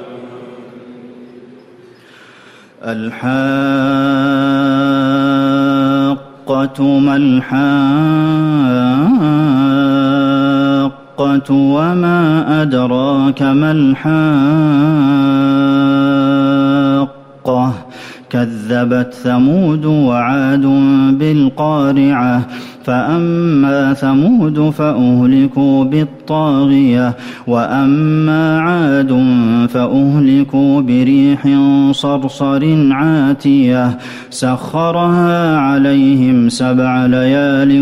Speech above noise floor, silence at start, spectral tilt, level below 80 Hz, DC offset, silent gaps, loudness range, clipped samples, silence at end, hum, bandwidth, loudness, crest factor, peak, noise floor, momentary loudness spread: 30 dB; 0 s; -7.5 dB/octave; -50 dBFS; under 0.1%; none; 3 LU; under 0.1%; 0 s; none; 11 kHz; -12 LUFS; 8 dB; -2 dBFS; -41 dBFS; 7 LU